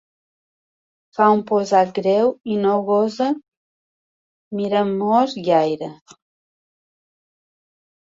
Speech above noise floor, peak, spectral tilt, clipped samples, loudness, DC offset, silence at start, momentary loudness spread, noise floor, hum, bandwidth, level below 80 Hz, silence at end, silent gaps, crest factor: over 72 dB; -2 dBFS; -6.5 dB/octave; under 0.1%; -19 LUFS; under 0.1%; 1.2 s; 12 LU; under -90 dBFS; none; 7.8 kHz; -68 dBFS; 2.2 s; 3.48-4.51 s; 18 dB